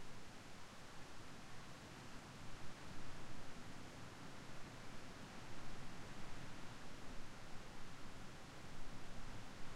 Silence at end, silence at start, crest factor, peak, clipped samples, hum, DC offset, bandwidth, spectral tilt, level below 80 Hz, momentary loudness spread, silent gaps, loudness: 0 s; 0 s; 12 dB; -34 dBFS; under 0.1%; none; under 0.1%; 13 kHz; -4 dB/octave; -58 dBFS; 2 LU; none; -56 LUFS